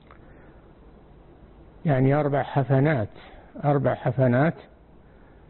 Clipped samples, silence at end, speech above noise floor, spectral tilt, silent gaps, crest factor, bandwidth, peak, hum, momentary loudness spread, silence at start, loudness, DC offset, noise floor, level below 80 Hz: under 0.1%; 0.9 s; 29 dB; -12.5 dB/octave; none; 14 dB; 4.2 kHz; -10 dBFS; none; 10 LU; 1.85 s; -23 LUFS; under 0.1%; -51 dBFS; -52 dBFS